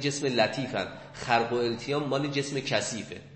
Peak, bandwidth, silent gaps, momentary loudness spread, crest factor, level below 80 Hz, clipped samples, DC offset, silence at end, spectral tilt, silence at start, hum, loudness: -10 dBFS; 8.8 kHz; none; 8 LU; 20 dB; -60 dBFS; under 0.1%; under 0.1%; 0 s; -4 dB/octave; 0 s; none; -29 LUFS